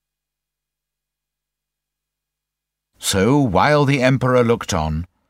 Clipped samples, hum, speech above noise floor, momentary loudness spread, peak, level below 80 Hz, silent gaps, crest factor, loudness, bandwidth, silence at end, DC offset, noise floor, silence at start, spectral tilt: under 0.1%; 50 Hz at -50 dBFS; 68 dB; 7 LU; -2 dBFS; -40 dBFS; none; 18 dB; -17 LUFS; 16 kHz; 0.25 s; under 0.1%; -84 dBFS; 3 s; -5.5 dB/octave